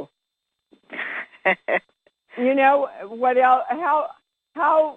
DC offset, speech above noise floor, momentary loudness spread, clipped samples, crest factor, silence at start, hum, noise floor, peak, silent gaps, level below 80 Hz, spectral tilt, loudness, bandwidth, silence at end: under 0.1%; 61 dB; 17 LU; under 0.1%; 18 dB; 0 s; none; -81 dBFS; -4 dBFS; none; -76 dBFS; -6 dB/octave; -21 LUFS; 4.3 kHz; 0 s